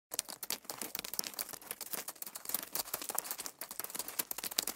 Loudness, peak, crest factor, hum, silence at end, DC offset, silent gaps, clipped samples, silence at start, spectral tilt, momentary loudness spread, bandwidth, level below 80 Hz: -39 LUFS; -6 dBFS; 36 dB; none; 0 s; under 0.1%; none; under 0.1%; 0.1 s; 0.5 dB/octave; 5 LU; 17 kHz; -76 dBFS